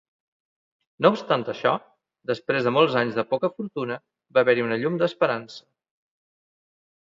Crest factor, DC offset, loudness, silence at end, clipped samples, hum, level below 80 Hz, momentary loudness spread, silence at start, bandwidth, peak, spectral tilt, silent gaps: 22 dB; under 0.1%; -24 LUFS; 1.45 s; under 0.1%; none; -72 dBFS; 12 LU; 1 s; 7.4 kHz; -2 dBFS; -6.5 dB/octave; none